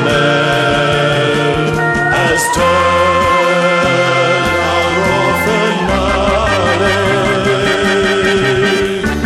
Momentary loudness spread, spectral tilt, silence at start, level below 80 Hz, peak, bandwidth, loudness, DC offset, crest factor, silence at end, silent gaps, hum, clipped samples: 2 LU; -4.5 dB/octave; 0 s; -30 dBFS; 0 dBFS; 15 kHz; -12 LUFS; under 0.1%; 12 dB; 0 s; none; none; under 0.1%